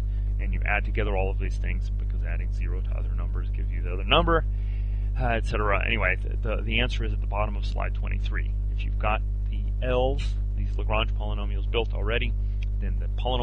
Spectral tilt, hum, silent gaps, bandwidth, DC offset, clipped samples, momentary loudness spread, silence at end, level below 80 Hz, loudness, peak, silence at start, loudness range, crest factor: -7 dB/octave; 50 Hz at -25 dBFS; none; 6.2 kHz; under 0.1%; under 0.1%; 6 LU; 0 s; -26 dBFS; -28 LUFS; -6 dBFS; 0 s; 3 LU; 18 dB